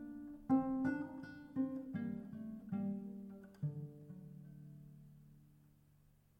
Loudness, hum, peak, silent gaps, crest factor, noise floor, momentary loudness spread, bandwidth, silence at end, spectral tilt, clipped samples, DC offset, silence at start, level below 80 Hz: -42 LUFS; none; -24 dBFS; none; 20 dB; -70 dBFS; 20 LU; 5.8 kHz; 0.7 s; -9.5 dB/octave; under 0.1%; under 0.1%; 0 s; -72 dBFS